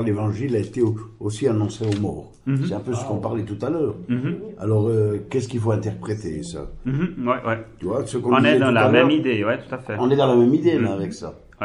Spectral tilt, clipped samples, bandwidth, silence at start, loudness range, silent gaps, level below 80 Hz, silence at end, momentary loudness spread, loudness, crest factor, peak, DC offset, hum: -7 dB/octave; under 0.1%; 11 kHz; 0 s; 7 LU; none; -48 dBFS; 0 s; 13 LU; -22 LUFS; 20 dB; -2 dBFS; under 0.1%; none